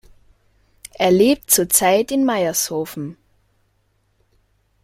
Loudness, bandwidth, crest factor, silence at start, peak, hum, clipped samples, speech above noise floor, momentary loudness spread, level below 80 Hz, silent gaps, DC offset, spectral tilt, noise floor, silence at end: -17 LUFS; 16.5 kHz; 20 dB; 1 s; 0 dBFS; none; under 0.1%; 47 dB; 14 LU; -54 dBFS; none; under 0.1%; -3.5 dB/octave; -64 dBFS; 1.7 s